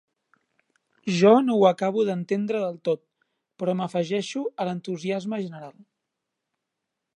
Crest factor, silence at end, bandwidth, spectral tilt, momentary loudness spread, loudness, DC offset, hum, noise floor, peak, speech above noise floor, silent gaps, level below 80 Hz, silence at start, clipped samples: 22 dB; 1.45 s; 11 kHz; -6.5 dB/octave; 14 LU; -24 LUFS; under 0.1%; none; -83 dBFS; -4 dBFS; 60 dB; none; -78 dBFS; 1.05 s; under 0.1%